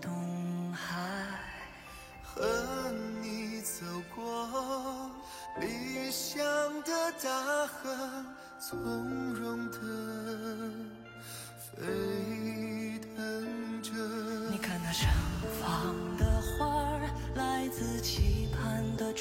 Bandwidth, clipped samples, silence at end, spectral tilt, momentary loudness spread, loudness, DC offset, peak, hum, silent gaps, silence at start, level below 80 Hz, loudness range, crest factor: 16.5 kHz; under 0.1%; 0 s; -4.5 dB/octave; 12 LU; -35 LUFS; under 0.1%; -18 dBFS; none; none; 0 s; -44 dBFS; 6 LU; 18 dB